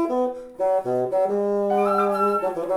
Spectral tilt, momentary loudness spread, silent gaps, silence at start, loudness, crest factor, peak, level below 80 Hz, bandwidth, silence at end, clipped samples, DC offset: -7 dB/octave; 5 LU; none; 0 s; -22 LUFS; 12 dB; -10 dBFS; -62 dBFS; 15 kHz; 0 s; under 0.1%; under 0.1%